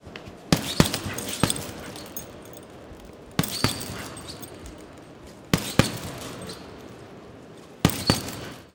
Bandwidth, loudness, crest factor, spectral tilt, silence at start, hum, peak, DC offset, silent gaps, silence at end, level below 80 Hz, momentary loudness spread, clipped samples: 19 kHz; -27 LUFS; 30 dB; -4 dB/octave; 0.05 s; none; 0 dBFS; under 0.1%; none; 0.05 s; -46 dBFS; 22 LU; under 0.1%